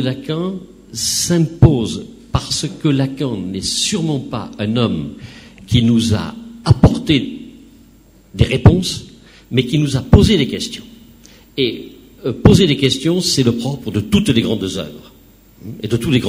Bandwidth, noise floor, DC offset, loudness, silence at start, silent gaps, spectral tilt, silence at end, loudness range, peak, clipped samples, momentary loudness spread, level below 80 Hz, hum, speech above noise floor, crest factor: 16 kHz; -46 dBFS; under 0.1%; -16 LUFS; 0 s; none; -5.5 dB/octave; 0 s; 3 LU; 0 dBFS; 0.3%; 17 LU; -32 dBFS; none; 31 dB; 16 dB